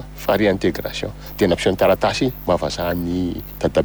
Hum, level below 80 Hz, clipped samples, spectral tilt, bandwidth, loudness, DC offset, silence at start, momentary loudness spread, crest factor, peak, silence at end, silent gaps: none; -38 dBFS; under 0.1%; -5.5 dB/octave; over 20 kHz; -20 LUFS; under 0.1%; 0 s; 9 LU; 16 dB; -4 dBFS; 0 s; none